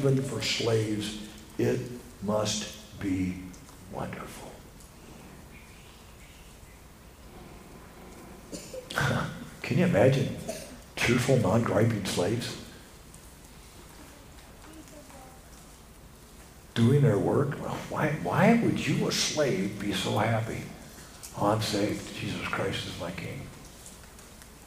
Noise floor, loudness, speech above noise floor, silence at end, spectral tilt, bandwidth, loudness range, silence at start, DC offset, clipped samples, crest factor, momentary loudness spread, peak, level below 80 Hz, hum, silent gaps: -50 dBFS; -28 LUFS; 23 dB; 0 s; -5.5 dB/octave; 15.5 kHz; 22 LU; 0 s; under 0.1%; under 0.1%; 22 dB; 25 LU; -8 dBFS; -54 dBFS; none; none